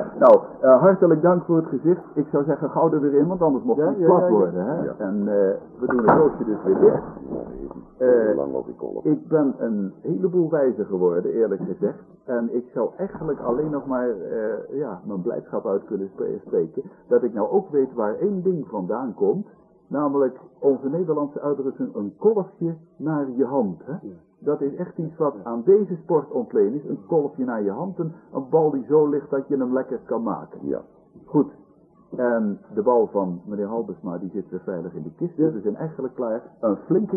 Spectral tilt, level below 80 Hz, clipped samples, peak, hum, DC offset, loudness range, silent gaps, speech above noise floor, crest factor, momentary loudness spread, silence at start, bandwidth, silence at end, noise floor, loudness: -12.5 dB/octave; -60 dBFS; under 0.1%; -4 dBFS; none; under 0.1%; 6 LU; none; 32 dB; 18 dB; 13 LU; 0 s; 2.5 kHz; 0 s; -54 dBFS; -22 LUFS